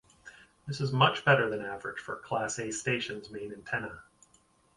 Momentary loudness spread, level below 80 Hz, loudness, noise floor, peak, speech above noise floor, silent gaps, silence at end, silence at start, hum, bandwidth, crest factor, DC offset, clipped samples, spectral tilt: 16 LU; -66 dBFS; -30 LUFS; -66 dBFS; -10 dBFS; 35 dB; none; 0.75 s; 0.25 s; none; 11.5 kHz; 22 dB; under 0.1%; under 0.1%; -4 dB/octave